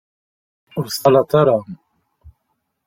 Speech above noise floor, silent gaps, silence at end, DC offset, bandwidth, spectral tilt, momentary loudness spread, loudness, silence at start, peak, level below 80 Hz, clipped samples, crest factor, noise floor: 56 dB; none; 0.6 s; under 0.1%; 16.5 kHz; -6 dB/octave; 16 LU; -16 LUFS; 0.75 s; -2 dBFS; -54 dBFS; under 0.1%; 18 dB; -72 dBFS